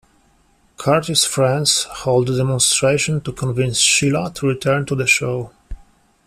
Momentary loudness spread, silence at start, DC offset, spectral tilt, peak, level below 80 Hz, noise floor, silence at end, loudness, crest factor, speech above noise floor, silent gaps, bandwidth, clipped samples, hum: 9 LU; 0.8 s; under 0.1%; -3.5 dB/octave; 0 dBFS; -44 dBFS; -57 dBFS; 0.5 s; -17 LUFS; 18 dB; 39 dB; none; 14.5 kHz; under 0.1%; none